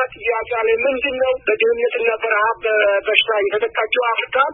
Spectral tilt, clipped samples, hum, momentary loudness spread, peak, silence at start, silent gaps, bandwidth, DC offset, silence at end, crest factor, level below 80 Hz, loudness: -4.5 dB/octave; under 0.1%; none; 4 LU; 0 dBFS; 0 s; none; 4 kHz; under 0.1%; 0 s; 18 dB; -54 dBFS; -17 LUFS